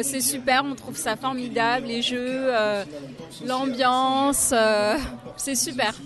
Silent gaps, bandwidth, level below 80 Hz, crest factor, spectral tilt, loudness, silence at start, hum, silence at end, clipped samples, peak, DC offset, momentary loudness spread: none; 12.5 kHz; -50 dBFS; 16 dB; -2 dB/octave; -23 LUFS; 0 s; none; 0 s; under 0.1%; -8 dBFS; under 0.1%; 11 LU